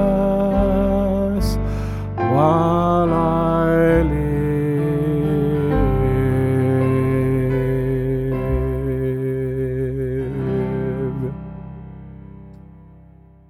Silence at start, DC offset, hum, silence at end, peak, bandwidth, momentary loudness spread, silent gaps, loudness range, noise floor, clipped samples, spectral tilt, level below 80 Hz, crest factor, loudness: 0 s; under 0.1%; none; 0.95 s; -4 dBFS; 14.5 kHz; 9 LU; none; 7 LU; -46 dBFS; under 0.1%; -9 dB/octave; -30 dBFS; 16 dB; -19 LUFS